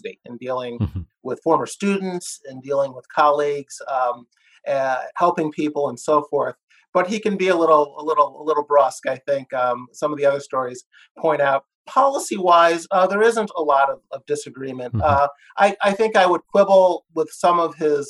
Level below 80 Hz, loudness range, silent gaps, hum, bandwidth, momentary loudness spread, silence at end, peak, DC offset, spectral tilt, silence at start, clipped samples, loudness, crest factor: -52 dBFS; 4 LU; 6.63-6.68 s, 6.89-6.93 s, 10.86-10.90 s, 11.11-11.15 s, 11.75-11.85 s; none; 12.5 kHz; 12 LU; 0 s; -2 dBFS; under 0.1%; -5 dB/octave; 0.05 s; under 0.1%; -20 LUFS; 16 dB